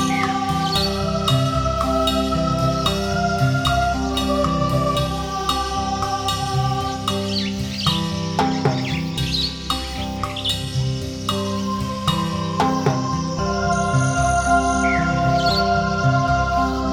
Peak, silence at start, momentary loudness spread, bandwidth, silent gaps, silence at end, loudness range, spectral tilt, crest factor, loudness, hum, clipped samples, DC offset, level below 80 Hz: -4 dBFS; 0 s; 5 LU; 19 kHz; none; 0 s; 4 LU; -5 dB/octave; 16 dB; -20 LUFS; none; under 0.1%; under 0.1%; -32 dBFS